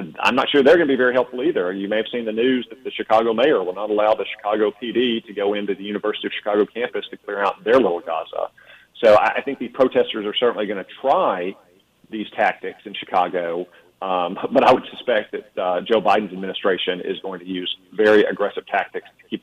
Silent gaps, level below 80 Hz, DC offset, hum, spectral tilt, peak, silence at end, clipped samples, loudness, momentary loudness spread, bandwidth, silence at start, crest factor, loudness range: none; -62 dBFS; under 0.1%; none; -5.5 dB/octave; -4 dBFS; 0.05 s; under 0.1%; -20 LUFS; 14 LU; 9.6 kHz; 0 s; 16 dB; 3 LU